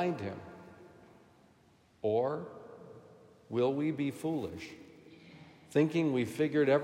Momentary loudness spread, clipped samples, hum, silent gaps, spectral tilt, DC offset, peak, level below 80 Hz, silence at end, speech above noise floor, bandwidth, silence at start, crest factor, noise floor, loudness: 25 LU; under 0.1%; none; none; -7 dB/octave; under 0.1%; -16 dBFS; -76 dBFS; 0 s; 34 dB; 15.5 kHz; 0 s; 20 dB; -65 dBFS; -33 LUFS